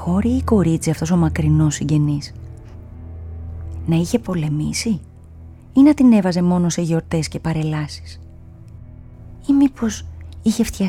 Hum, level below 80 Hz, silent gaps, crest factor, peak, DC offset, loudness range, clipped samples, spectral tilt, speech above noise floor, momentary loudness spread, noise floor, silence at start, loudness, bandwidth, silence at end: none; -36 dBFS; none; 16 dB; -2 dBFS; under 0.1%; 6 LU; under 0.1%; -6.5 dB/octave; 22 dB; 21 LU; -39 dBFS; 0 s; -18 LUFS; 15.5 kHz; 0 s